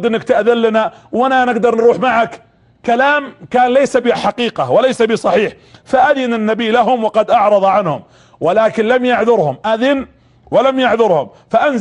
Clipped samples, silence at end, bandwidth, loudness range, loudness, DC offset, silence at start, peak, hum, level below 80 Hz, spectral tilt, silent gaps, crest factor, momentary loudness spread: under 0.1%; 0 s; 10.5 kHz; 1 LU; -13 LUFS; under 0.1%; 0 s; -2 dBFS; none; -54 dBFS; -5.5 dB/octave; none; 12 dB; 6 LU